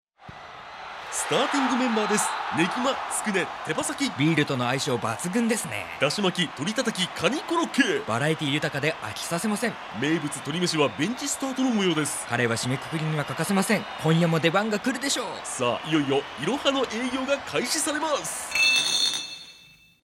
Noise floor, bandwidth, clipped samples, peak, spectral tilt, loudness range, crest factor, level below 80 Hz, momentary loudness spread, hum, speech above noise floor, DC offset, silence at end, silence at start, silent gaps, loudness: -53 dBFS; 16.5 kHz; under 0.1%; -6 dBFS; -3.5 dB/octave; 2 LU; 20 dB; -64 dBFS; 7 LU; none; 28 dB; under 0.1%; 0.45 s; 0.2 s; none; -25 LUFS